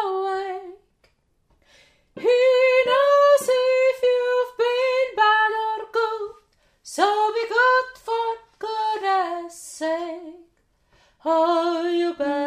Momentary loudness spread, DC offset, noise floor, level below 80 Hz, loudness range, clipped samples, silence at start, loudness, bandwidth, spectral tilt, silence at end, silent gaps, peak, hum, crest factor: 15 LU; under 0.1%; -65 dBFS; -68 dBFS; 7 LU; under 0.1%; 0 s; -21 LUFS; 14.5 kHz; -2 dB/octave; 0 s; none; -6 dBFS; none; 16 dB